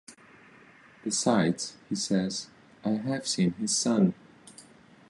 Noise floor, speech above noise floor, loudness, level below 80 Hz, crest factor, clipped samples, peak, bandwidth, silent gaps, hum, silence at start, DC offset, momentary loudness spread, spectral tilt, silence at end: -55 dBFS; 28 dB; -28 LUFS; -68 dBFS; 18 dB; under 0.1%; -12 dBFS; 11.5 kHz; none; none; 0.1 s; under 0.1%; 12 LU; -4.5 dB/octave; 0.5 s